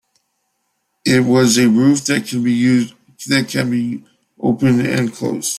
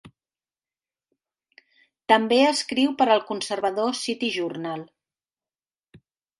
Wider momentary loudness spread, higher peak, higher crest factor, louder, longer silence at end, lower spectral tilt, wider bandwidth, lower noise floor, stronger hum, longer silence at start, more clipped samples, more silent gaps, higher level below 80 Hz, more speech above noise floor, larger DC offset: about the same, 11 LU vs 13 LU; about the same, -2 dBFS vs -4 dBFS; second, 14 dB vs 22 dB; first, -16 LUFS vs -23 LUFS; second, 0 s vs 0.4 s; first, -5 dB/octave vs -3.5 dB/octave; first, 15 kHz vs 11.5 kHz; second, -69 dBFS vs under -90 dBFS; neither; first, 1.05 s vs 0.05 s; neither; neither; first, -56 dBFS vs -72 dBFS; second, 54 dB vs over 68 dB; neither